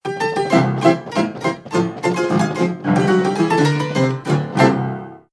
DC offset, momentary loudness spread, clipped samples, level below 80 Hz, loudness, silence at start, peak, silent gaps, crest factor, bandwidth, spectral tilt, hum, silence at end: under 0.1%; 6 LU; under 0.1%; -58 dBFS; -18 LUFS; 0.05 s; 0 dBFS; none; 18 dB; 11 kHz; -6.5 dB/octave; none; 0.15 s